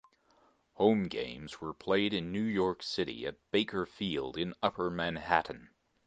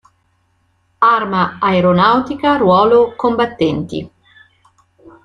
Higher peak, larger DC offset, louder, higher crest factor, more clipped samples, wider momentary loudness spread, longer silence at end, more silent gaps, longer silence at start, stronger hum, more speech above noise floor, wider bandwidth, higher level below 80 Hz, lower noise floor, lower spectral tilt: second, -10 dBFS vs 0 dBFS; neither; second, -33 LUFS vs -13 LUFS; first, 24 dB vs 14 dB; neither; first, 12 LU vs 7 LU; second, 0.4 s vs 1.15 s; neither; second, 0.8 s vs 1 s; neither; second, 35 dB vs 47 dB; about the same, 9 kHz vs 9.6 kHz; second, -62 dBFS vs -50 dBFS; first, -68 dBFS vs -60 dBFS; second, -6 dB/octave vs -7.5 dB/octave